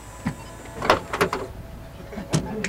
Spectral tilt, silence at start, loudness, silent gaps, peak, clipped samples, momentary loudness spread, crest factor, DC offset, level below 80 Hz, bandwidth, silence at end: -4.5 dB/octave; 0 s; -26 LUFS; none; -2 dBFS; under 0.1%; 18 LU; 24 dB; under 0.1%; -42 dBFS; 16.5 kHz; 0 s